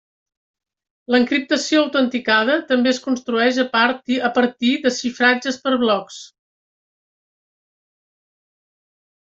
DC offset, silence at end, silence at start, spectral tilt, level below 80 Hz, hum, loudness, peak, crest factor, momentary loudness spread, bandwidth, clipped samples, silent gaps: under 0.1%; 3 s; 1.1 s; -3 dB/octave; -66 dBFS; none; -18 LUFS; -2 dBFS; 18 dB; 5 LU; 7.8 kHz; under 0.1%; none